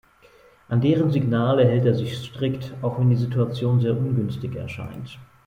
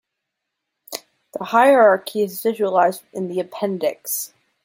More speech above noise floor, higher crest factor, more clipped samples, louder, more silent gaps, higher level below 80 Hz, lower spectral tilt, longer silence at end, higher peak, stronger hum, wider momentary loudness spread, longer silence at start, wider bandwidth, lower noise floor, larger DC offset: second, 32 dB vs 62 dB; about the same, 16 dB vs 18 dB; neither; second, -22 LUFS vs -19 LUFS; neither; first, -54 dBFS vs -74 dBFS; first, -9 dB/octave vs -4 dB/octave; second, 0.2 s vs 0.4 s; second, -6 dBFS vs -2 dBFS; neither; second, 14 LU vs 20 LU; second, 0.7 s vs 0.9 s; second, 7 kHz vs 16.5 kHz; second, -53 dBFS vs -80 dBFS; neither